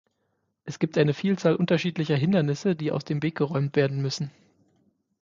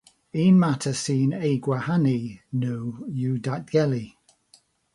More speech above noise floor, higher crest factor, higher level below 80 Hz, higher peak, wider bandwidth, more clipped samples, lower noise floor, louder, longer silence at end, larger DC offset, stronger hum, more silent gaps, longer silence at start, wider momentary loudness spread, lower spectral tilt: first, 50 dB vs 37 dB; about the same, 18 dB vs 16 dB; about the same, -66 dBFS vs -62 dBFS; about the same, -8 dBFS vs -8 dBFS; second, 7.6 kHz vs 11.5 kHz; neither; first, -75 dBFS vs -60 dBFS; about the same, -25 LUFS vs -24 LUFS; about the same, 0.9 s vs 0.85 s; neither; neither; neither; first, 0.65 s vs 0.35 s; second, 8 LU vs 12 LU; about the same, -7 dB/octave vs -7 dB/octave